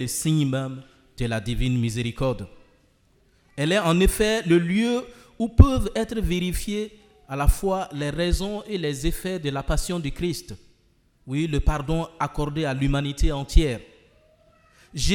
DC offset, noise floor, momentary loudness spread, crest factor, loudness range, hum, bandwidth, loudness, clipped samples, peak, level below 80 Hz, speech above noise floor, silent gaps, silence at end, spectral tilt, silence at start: under 0.1%; -62 dBFS; 13 LU; 24 dB; 6 LU; none; 18 kHz; -24 LUFS; under 0.1%; 0 dBFS; -30 dBFS; 39 dB; none; 0 s; -5.5 dB/octave; 0 s